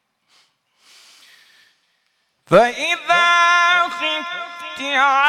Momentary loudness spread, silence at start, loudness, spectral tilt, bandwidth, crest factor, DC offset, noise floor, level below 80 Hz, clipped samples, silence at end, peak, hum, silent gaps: 15 LU; 2.5 s; -16 LUFS; -2.5 dB/octave; 15 kHz; 18 dB; under 0.1%; -67 dBFS; -58 dBFS; under 0.1%; 0 s; -2 dBFS; none; none